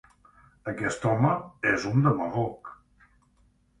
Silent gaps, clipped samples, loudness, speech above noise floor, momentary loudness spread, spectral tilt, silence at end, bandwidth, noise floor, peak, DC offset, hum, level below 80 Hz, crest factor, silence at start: none; under 0.1%; -26 LUFS; 39 dB; 15 LU; -7 dB/octave; 1.05 s; 11 kHz; -64 dBFS; -10 dBFS; under 0.1%; none; -58 dBFS; 20 dB; 0.65 s